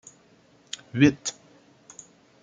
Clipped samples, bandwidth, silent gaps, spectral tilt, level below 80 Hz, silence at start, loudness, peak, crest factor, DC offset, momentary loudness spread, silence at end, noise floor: under 0.1%; 9.4 kHz; none; -5 dB/octave; -62 dBFS; 0.95 s; -24 LUFS; -6 dBFS; 24 dB; under 0.1%; 25 LU; 1.1 s; -58 dBFS